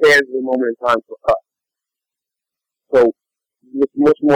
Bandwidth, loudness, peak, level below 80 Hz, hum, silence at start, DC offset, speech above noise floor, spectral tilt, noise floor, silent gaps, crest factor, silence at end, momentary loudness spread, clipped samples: 15.5 kHz; -17 LUFS; -6 dBFS; -54 dBFS; none; 0 s; under 0.1%; 71 dB; -5 dB/octave; -85 dBFS; none; 12 dB; 0 s; 7 LU; under 0.1%